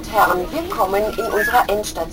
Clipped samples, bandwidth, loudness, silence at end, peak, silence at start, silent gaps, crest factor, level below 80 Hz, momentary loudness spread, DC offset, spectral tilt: under 0.1%; 17 kHz; -18 LUFS; 0 s; -2 dBFS; 0 s; none; 18 dB; -38 dBFS; 5 LU; 0.1%; -3.5 dB/octave